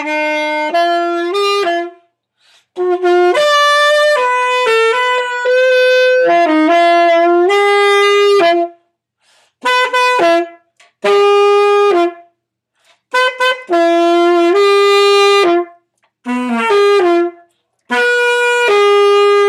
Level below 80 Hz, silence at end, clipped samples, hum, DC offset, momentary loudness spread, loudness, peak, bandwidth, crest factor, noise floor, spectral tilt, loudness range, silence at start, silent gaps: -76 dBFS; 0 s; under 0.1%; none; under 0.1%; 8 LU; -11 LUFS; 0 dBFS; 14 kHz; 12 dB; -68 dBFS; -2 dB/octave; 4 LU; 0 s; none